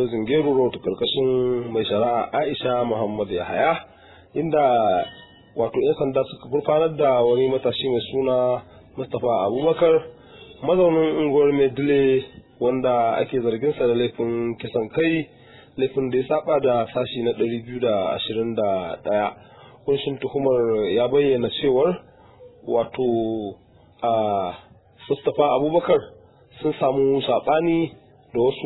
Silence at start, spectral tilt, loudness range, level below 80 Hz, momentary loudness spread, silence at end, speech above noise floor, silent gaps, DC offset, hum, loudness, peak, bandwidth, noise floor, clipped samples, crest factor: 0 s; -10.5 dB/octave; 3 LU; -56 dBFS; 9 LU; 0 s; 27 dB; none; under 0.1%; none; -22 LUFS; -6 dBFS; 4.1 kHz; -48 dBFS; under 0.1%; 16 dB